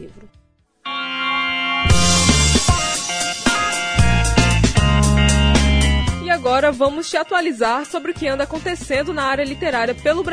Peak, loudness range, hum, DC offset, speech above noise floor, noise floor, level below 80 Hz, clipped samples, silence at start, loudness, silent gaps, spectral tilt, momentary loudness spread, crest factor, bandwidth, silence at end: -2 dBFS; 4 LU; none; under 0.1%; 17 dB; -37 dBFS; -24 dBFS; under 0.1%; 0 s; -17 LUFS; none; -4 dB/octave; 8 LU; 16 dB; 11 kHz; 0 s